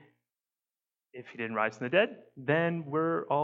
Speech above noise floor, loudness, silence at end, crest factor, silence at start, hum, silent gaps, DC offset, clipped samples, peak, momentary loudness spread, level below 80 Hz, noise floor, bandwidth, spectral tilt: over 60 dB; -30 LUFS; 0 s; 20 dB; 1.15 s; none; none; under 0.1%; under 0.1%; -12 dBFS; 17 LU; -82 dBFS; under -90 dBFS; 7.6 kHz; -7 dB/octave